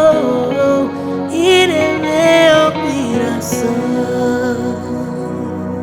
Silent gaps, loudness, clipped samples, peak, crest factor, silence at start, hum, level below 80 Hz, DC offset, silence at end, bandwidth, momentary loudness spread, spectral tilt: none; -14 LUFS; under 0.1%; 0 dBFS; 14 dB; 0 s; none; -50 dBFS; under 0.1%; 0 s; 17.5 kHz; 12 LU; -4.5 dB/octave